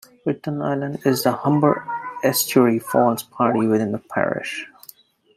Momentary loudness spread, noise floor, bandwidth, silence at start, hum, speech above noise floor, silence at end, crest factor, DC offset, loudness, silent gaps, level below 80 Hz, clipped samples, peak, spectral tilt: 10 LU; -49 dBFS; 16 kHz; 0.25 s; none; 29 dB; 0.7 s; 18 dB; under 0.1%; -20 LUFS; none; -64 dBFS; under 0.1%; -2 dBFS; -5 dB/octave